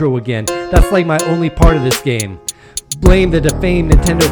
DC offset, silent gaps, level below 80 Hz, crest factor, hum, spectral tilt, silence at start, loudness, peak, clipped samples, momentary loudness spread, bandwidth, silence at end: under 0.1%; none; -16 dBFS; 12 dB; none; -5.5 dB/octave; 0 s; -13 LUFS; 0 dBFS; 0.9%; 11 LU; 19.5 kHz; 0 s